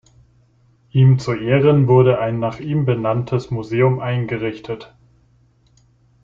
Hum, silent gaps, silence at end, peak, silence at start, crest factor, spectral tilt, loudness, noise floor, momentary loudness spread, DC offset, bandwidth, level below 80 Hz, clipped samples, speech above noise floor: none; none; 1.4 s; -2 dBFS; 0.95 s; 16 dB; -9 dB/octave; -17 LUFS; -56 dBFS; 11 LU; under 0.1%; 7.4 kHz; -52 dBFS; under 0.1%; 39 dB